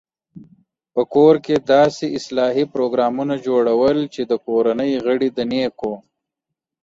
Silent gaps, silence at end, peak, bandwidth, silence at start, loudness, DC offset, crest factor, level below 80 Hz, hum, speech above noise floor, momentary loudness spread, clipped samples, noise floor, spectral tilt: none; 0.85 s; -2 dBFS; 7.8 kHz; 0.35 s; -18 LUFS; under 0.1%; 16 dB; -58 dBFS; none; 65 dB; 10 LU; under 0.1%; -83 dBFS; -6 dB/octave